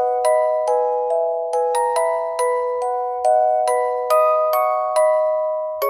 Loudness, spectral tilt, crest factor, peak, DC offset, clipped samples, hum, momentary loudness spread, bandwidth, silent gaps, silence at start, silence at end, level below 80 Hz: -19 LUFS; 0 dB/octave; 14 dB; -4 dBFS; under 0.1%; under 0.1%; none; 5 LU; 15 kHz; none; 0 s; 0 s; -70 dBFS